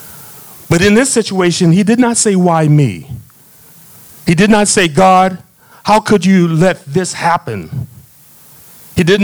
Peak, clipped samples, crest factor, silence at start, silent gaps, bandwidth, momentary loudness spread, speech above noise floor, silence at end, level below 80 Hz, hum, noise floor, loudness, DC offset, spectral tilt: 0 dBFS; under 0.1%; 12 dB; 0 s; none; over 20 kHz; 21 LU; 32 dB; 0 s; -44 dBFS; none; -42 dBFS; -11 LUFS; under 0.1%; -5 dB/octave